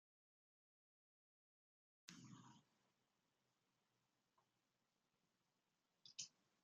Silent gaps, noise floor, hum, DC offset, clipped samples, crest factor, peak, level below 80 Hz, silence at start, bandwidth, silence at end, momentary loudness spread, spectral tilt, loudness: none; -90 dBFS; none; under 0.1%; under 0.1%; 34 dB; -36 dBFS; under -90 dBFS; 2.05 s; 7.4 kHz; 0.3 s; 11 LU; -2.5 dB/octave; -60 LUFS